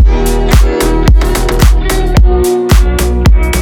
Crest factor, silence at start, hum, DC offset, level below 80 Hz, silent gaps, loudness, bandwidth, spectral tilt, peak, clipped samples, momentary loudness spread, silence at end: 8 dB; 0 s; none; under 0.1%; -8 dBFS; none; -10 LUFS; 17.5 kHz; -5.5 dB/octave; 0 dBFS; 0.5%; 2 LU; 0 s